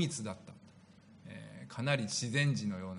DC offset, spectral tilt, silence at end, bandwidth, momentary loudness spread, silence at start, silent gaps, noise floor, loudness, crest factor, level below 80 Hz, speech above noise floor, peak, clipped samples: under 0.1%; -4.5 dB/octave; 0 s; 10.5 kHz; 20 LU; 0 s; none; -59 dBFS; -34 LUFS; 22 dB; -74 dBFS; 25 dB; -16 dBFS; under 0.1%